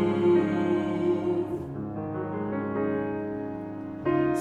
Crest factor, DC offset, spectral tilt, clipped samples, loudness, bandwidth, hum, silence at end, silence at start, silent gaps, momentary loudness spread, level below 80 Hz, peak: 14 dB; under 0.1%; -8.5 dB/octave; under 0.1%; -28 LUFS; 7 kHz; none; 0 s; 0 s; none; 11 LU; -58 dBFS; -12 dBFS